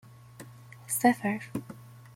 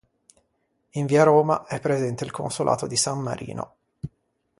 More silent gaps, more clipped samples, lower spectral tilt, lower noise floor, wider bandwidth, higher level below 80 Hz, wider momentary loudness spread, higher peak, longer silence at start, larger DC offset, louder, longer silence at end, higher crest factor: neither; neither; about the same, -4.5 dB/octave vs -5 dB/octave; second, -49 dBFS vs -72 dBFS; first, 16.5 kHz vs 11.5 kHz; second, -70 dBFS vs -58 dBFS; about the same, 24 LU vs 22 LU; second, -10 dBFS vs -4 dBFS; second, 0.4 s vs 0.95 s; neither; second, -29 LUFS vs -23 LUFS; second, 0.15 s vs 0.5 s; about the same, 22 dB vs 20 dB